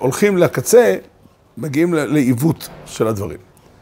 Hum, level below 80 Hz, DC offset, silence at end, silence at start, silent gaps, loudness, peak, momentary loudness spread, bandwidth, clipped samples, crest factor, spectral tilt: none; -52 dBFS; under 0.1%; 0.45 s; 0 s; none; -16 LUFS; 0 dBFS; 17 LU; 16.5 kHz; under 0.1%; 16 dB; -6 dB/octave